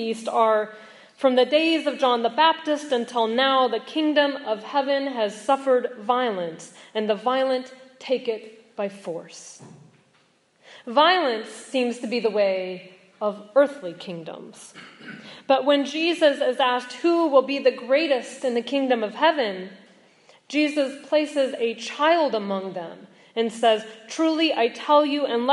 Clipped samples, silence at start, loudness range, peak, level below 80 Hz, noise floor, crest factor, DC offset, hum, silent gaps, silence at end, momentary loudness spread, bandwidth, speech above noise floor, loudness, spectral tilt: under 0.1%; 0 s; 6 LU; -4 dBFS; -84 dBFS; -62 dBFS; 20 dB; under 0.1%; none; none; 0 s; 16 LU; 11.5 kHz; 40 dB; -22 LUFS; -4 dB/octave